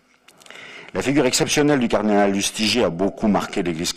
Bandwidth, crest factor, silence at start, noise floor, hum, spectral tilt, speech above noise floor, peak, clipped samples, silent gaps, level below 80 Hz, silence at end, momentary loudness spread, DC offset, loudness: 15.5 kHz; 16 dB; 0.5 s; -51 dBFS; none; -4 dB/octave; 32 dB; -6 dBFS; under 0.1%; none; -48 dBFS; 0 s; 12 LU; under 0.1%; -19 LUFS